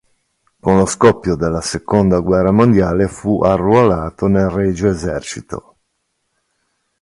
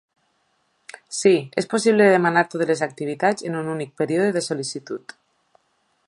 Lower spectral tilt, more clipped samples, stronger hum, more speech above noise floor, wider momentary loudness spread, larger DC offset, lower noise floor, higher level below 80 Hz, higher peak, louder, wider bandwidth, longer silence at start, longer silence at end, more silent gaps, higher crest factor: first, -6.5 dB/octave vs -5 dB/octave; neither; neither; first, 55 dB vs 47 dB; second, 11 LU vs 14 LU; neither; about the same, -69 dBFS vs -68 dBFS; first, -36 dBFS vs -72 dBFS; about the same, 0 dBFS vs -2 dBFS; first, -15 LUFS vs -21 LUFS; about the same, 11.5 kHz vs 11.5 kHz; second, 0.65 s vs 1.1 s; first, 1.4 s vs 1.1 s; neither; about the same, 16 dB vs 20 dB